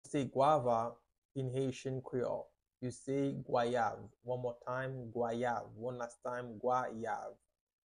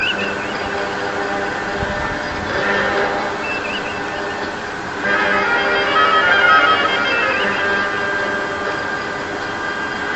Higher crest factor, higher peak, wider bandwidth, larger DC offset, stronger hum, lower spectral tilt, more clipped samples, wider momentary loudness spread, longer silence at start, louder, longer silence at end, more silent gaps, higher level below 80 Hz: about the same, 20 dB vs 18 dB; second, -18 dBFS vs 0 dBFS; first, 11 kHz vs 8.6 kHz; second, under 0.1% vs 0.2%; neither; first, -6.5 dB/octave vs -3.5 dB/octave; neither; about the same, 12 LU vs 11 LU; about the same, 0.05 s vs 0 s; second, -38 LUFS vs -17 LUFS; first, 0.55 s vs 0 s; first, 1.18-1.29 s vs none; second, -70 dBFS vs -44 dBFS